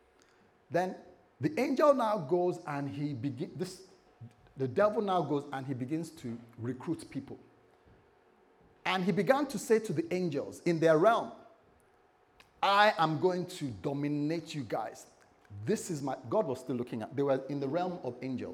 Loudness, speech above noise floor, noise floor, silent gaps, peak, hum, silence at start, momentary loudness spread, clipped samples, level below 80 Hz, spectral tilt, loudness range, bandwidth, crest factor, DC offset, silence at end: -32 LUFS; 35 dB; -66 dBFS; none; -12 dBFS; none; 0.7 s; 15 LU; under 0.1%; -74 dBFS; -6 dB/octave; 6 LU; 16.5 kHz; 22 dB; under 0.1%; 0 s